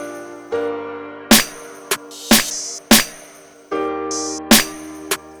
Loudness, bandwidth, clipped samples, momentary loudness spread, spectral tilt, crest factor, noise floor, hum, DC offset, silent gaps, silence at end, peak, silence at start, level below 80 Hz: -17 LUFS; over 20 kHz; under 0.1%; 18 LU; -1.5 dB/octave; 18 dB; -43 dBFS; none; under 0.1%; none; 0 s; 0 dBFS; 0 s; -44 dBFS